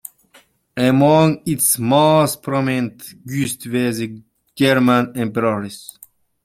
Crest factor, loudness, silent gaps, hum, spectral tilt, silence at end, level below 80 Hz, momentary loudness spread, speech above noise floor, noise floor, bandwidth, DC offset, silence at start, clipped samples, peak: 16 dB; -17 LUFS; none; none; -5 dB/octave; 0.65 s; -56 dBFS; 18 LU; 36 dB; -53 dBFS; 16 kHz; under 0.1%; 0.75 s; under 0.1%; -2 dBFS